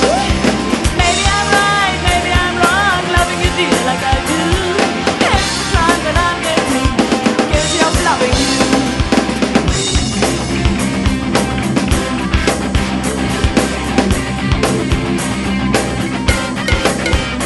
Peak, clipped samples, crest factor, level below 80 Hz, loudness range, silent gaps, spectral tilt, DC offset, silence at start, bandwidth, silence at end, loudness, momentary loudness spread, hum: 0 dBFS; under 0.1%; 14 dB; -22 dBFS; 3 LU; none; -4 dB/octave; under 0.1%; 0 s; 12 kHz; 0 s; -14 LUFS; 4 LU; none